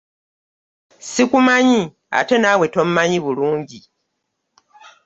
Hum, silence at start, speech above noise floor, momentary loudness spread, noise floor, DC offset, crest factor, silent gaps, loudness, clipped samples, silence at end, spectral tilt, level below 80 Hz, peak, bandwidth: none; 1.05 s; 58 dB; 12 LU; -74 dBFS; under 0.1%; 16 dB; none; -16 LUFS; under 0.1%; 1.25 s; -4.5 dB/octave; -60 dBFS; -2 dBFS; 8 kHz